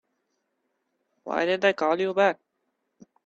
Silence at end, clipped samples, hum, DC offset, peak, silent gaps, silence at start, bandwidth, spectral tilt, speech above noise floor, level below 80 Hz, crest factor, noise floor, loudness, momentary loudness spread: 0.9 s; under 0.1%; none; under 0.1%; -8 dBFS; none; 1.25 s; 7.6 kHz; -5 dB/octave; 54 dB; -76 dBFS; 20 dB; -77 dBFS; -24 LUFS; 14 LU